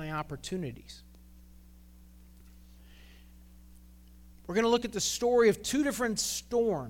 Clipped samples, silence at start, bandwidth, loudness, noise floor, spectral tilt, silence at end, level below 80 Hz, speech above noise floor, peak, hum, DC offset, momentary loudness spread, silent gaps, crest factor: under 0.1%; 0 s; 17.5 kHz; -29 LUFS; -54 dBFS; -3.5 dB/octave; 0 s; -54 dBFS; 25 dB; -14 dBFS; none; under 0.1%; 21 LU; none; 20 dB